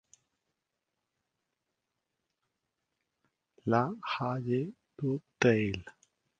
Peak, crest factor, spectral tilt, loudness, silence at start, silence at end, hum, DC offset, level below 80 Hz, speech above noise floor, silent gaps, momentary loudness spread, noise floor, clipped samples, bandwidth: -8 dBFS; 26 dB; -6.5 dB/octave; -32 LUFS; 3.65 s; 0.5 s; none; under 0.1%; -64 dBFS; 55 dB; none; 12 LU; -86 dBFS; under 0.1%; 7.6 kHz